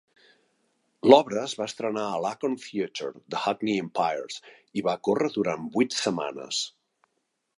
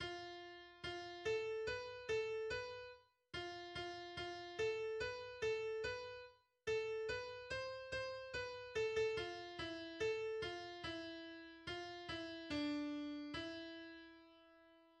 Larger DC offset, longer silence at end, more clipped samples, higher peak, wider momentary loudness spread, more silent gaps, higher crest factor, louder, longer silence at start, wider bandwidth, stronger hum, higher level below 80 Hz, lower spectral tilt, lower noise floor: neither; first, 0.9 s vs 0.1 s; neither; first, -2 dBFS vs -30 dBFS; first, 15 LU vs 11 LU; neither; first, 26 dB vs 16 dB; first, -26 LUFS vs -45 LUFS; first, 1.05 s vs 0 s; first, 11.5 kHz vs 9.8 kHz; neither; about the same, -74 dBFS vs -70 dBFS; about the same, -4 dB/octave vs -4 dB/octave; first, -77 dBFS vs -68 dBFS